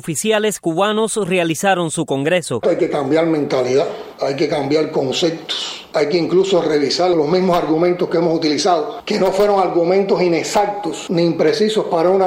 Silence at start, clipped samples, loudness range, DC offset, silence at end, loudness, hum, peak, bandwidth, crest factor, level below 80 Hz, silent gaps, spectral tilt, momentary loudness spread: 0.05 s; under 0.1%; 2 LU; under 0.1%; 0 s; -17 LUFS; none; -2 dBFS; 16 kHz; 14 dB; -54 dBFS; none; -4.5 dB/octave; 5 LU